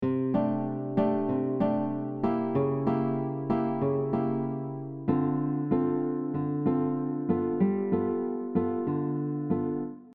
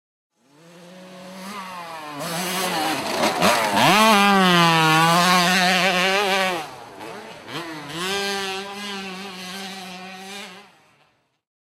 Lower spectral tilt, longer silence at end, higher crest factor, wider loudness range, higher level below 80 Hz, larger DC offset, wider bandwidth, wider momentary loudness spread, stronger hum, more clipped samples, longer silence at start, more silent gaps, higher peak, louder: first, -12 dB/octave vs -3.5 dB/octave; second, 0 s vs 1 s; about the same, 16 dB vs 20 dB; second, 1 LU vs 13 LU; about the same, -64 dBFS vs -64 dBFS; neither; second, 4.6 kHz vs 16 kHz; second, 4 LU vs 21 LU; neither; neither; second, 0 s vs 0.75 s; neither; second, -12 dBFS vs -2 dBFS; second, -29 LUFS vs -18 LUFS